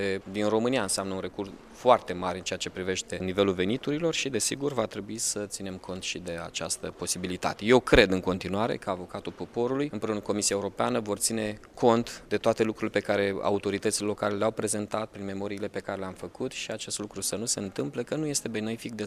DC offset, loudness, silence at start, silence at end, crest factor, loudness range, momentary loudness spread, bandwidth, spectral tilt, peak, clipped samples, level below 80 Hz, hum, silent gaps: under 0.1%; -29 LUFS; 0 s; 0 s; 26 dB; 5 LU; 10 LU; 15.5 kHz; -3.5 dB/octave; -2 dBFS; under 0.1%; -50 dBFS; none; none